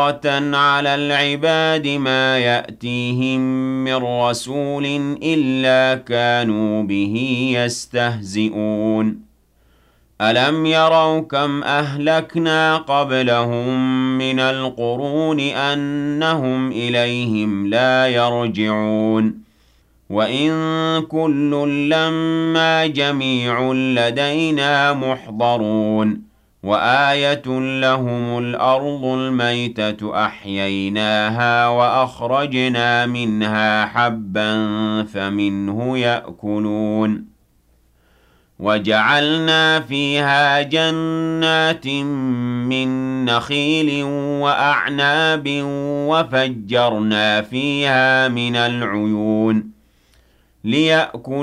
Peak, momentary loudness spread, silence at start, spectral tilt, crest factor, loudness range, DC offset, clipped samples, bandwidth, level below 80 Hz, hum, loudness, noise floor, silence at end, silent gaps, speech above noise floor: -4 dBFS; 7 LU; 0 s; -5.5 dB/octave; 14 dB; 3 LU; under 0.1%; under 0.1%; 12.5 kHz; -58 dBFS; none; -17 LUFS; -57 dBFS; 0 s; none; 39 dB